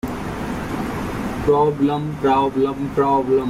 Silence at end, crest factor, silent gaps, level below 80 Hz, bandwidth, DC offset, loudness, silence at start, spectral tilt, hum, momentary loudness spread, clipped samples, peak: 0 s; 14 dB; none; -40 dBFS; 15.5 kHz; under 0.1%; -20 LUFS; 0.05 s; -7 dB/octave; none; 9 LU; under 0.1%; -6 dBFS